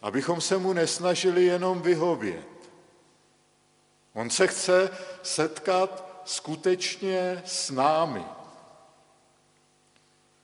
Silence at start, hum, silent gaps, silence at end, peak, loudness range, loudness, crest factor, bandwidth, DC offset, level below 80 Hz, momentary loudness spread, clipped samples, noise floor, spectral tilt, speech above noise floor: 0.05 s; 50 Hz at -65 dBFS; none; 1.85 s; -6 dBFS; 3 LU; -26 LUFS; 22 dB; 11.5 kHz; under 0.1%; -76 dBFS; 13 LU; under 0.1%; -64 dBFS; -3.5 dB/octave; 39 dB